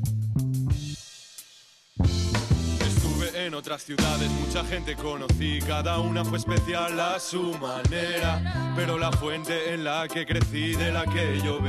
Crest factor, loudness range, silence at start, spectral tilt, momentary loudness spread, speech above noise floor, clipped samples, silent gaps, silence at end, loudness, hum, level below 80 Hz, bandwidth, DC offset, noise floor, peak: 14 dB; 1 LU; 0 s; -5 dB/octave; 6 LU; 28 dB; under 0.1%; none; 0 s; -27 LUFS; none; -36 dBFS; 13.5 kHz; under 0.1%; -54 dBFS; -14 dBFS